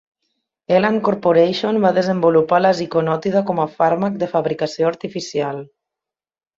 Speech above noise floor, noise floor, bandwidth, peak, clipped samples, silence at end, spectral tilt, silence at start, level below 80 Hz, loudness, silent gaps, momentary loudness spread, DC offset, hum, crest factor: over 73 dB; under -90 dBFS; 7.6 kHz; -2 dBFS; under 0.1%; 0.95 s; -6.5 dB/octave; 0.7 s; -60 dBFS; -18 LUFS; none; 8 LU; under 0.1%; none; 16 dB